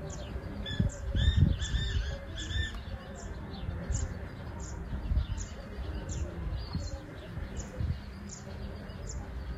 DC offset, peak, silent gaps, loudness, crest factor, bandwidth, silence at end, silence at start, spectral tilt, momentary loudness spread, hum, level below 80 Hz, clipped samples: under 0.1%; -12 dBFS; none; -36 LUFS; 22 dB; 8.8 kHz; 0 s; 0 s; -5 dB/octave; 12 LU; none; -38 dBFS; under 0.1%